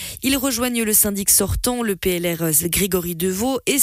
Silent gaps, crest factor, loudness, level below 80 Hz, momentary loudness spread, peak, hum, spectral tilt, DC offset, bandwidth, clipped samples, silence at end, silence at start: none; 16 dB; -18 LUFS; -36 dBFS; 6 LU; -4 dBFS; none; -3 dB/octave; under 0.1%; 16 kHz; under 0.1%; 0 s; 0 s